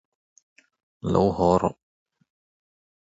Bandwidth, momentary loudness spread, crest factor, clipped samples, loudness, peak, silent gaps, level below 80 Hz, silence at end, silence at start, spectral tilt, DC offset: 7.8 kHz; 10 LU; 22 dB; under 0.1%; -23 LUFS; -6 dBFS; none; -48 dBFS; 1.45 s; 1.05 s; -8 dB/octave; under 0.1%